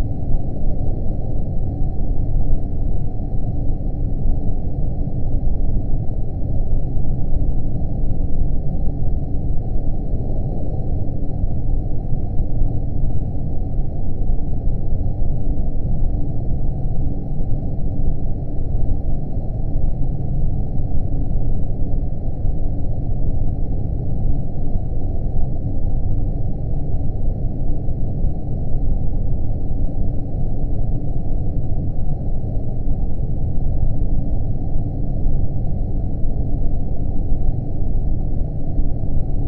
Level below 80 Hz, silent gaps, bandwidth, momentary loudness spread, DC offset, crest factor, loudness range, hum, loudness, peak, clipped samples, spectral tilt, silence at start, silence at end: -18 dBFS; none; 0.9 kHz; 2 LU; under 0.1%; 12 dB; 1 LU; none; -25 LUFS; -4 dBFS; under 0.1%; -13.5 dB/octave; 0 s; 0 s